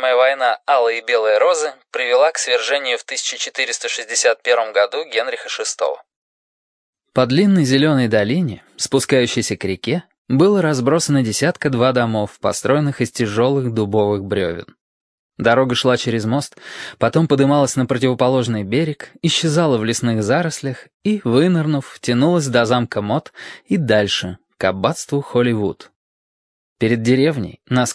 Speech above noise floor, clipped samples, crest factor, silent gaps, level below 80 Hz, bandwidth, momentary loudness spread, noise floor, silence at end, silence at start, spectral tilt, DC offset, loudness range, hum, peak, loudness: over 73 dB; under 0.1%; 18 dB; 6.16-6.93 s, 10.18-10.25 s, 14.81-15.30 s, 20.94-21.00 s, 25.96-26.76 s; -56 dBFS; 11 kHz; 8 LU; under -90 dBFS; 0 s; 0 s; -5 dB/octave; under 0.1%; 3 LU; none; 0 dBFS; -17 LUFS